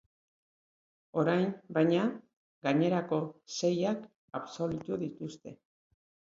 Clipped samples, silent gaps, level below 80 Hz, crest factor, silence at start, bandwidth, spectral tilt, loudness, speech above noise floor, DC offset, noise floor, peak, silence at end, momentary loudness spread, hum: under 0.1%; 2.33-2.61 s, 4.16-4.28 s; -72 dBFS; 20 dB; 1.15 s; 7.8 kHz; -6.5 dB/octave; -32 LUFS; over 59 dB; under 0.1%; under -90 dBFS; -14 dBFS; 0.85 s; 15 LU; none